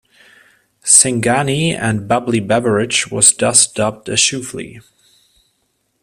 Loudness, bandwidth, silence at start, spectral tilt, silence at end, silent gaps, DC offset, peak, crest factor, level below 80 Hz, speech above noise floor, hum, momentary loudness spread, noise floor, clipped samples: -13 LUFS; over 20 kHz; 0.85 s; -2.5 dB/octave; 1.2 s; none; under 0.1%; 0 dBFS; 16 dB; -52 dBFS; 50 dB; none; 16 LU; -66 dBFS; under 0.1%